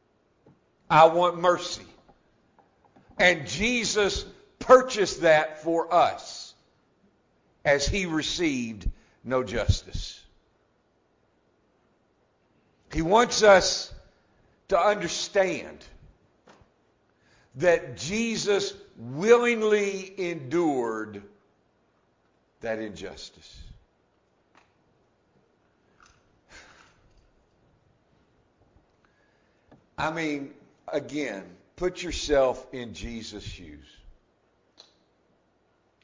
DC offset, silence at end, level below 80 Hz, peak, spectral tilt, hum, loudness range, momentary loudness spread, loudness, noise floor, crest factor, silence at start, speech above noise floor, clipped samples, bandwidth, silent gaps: under 0.1%; 1.95 s; -46 dBFS; -4 dBFS; -4 dB/octave; none; 17 LU; 21 LU; -24 LUFS; -68 dBFS; 24 dB; 0.9 s; 43 dB; under 0.1%; 7.6 kHz; none